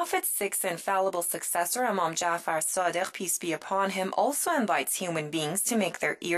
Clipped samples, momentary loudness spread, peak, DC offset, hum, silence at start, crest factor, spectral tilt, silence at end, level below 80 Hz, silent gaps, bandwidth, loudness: under 0.1%; 3 LU; -12 dBFS; under 0.1%; none; 0 s; 16 dB; -2.5 dB/octave; 0 s; -76 dBFS; none; 14.5 kHz; -28 LUFS